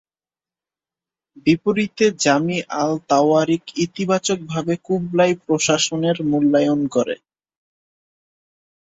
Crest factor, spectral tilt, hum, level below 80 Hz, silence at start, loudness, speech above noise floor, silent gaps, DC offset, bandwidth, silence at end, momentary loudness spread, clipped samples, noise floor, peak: 18 dB; -4.5 dB/octave; none; -60 dBFS; 1.45 s; -19 LUFS; over 72 dB; none; under 0.1%; 8 kHz; 1.75 s; 7 LU; under 0.1%; under -90 dBFS; -2 dBFS